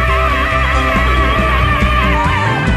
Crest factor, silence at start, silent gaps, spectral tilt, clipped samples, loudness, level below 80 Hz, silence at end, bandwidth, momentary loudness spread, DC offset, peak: 10 dB; 0 s; none; -6 dB/octave; under 0.1%; -13 LUFS; -18 dBFS; 0 s; 13 kHz; 1 LU; under 0.1%; -2 dBFS